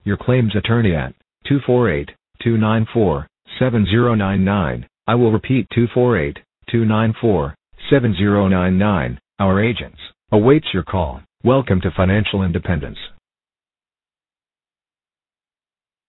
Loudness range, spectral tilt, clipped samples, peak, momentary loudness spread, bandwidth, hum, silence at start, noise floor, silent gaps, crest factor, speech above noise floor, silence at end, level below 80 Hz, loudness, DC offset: 3 LU; -12 dB/octave; under 0.1%; 0 dBFS; 11 LU; 4.1 kHz; none; 0.05 s; under -90 dBFS; none; 18 dB; over 74 dB; 2.95 s; -38 dBFS; -17 LUFS; under 0.1%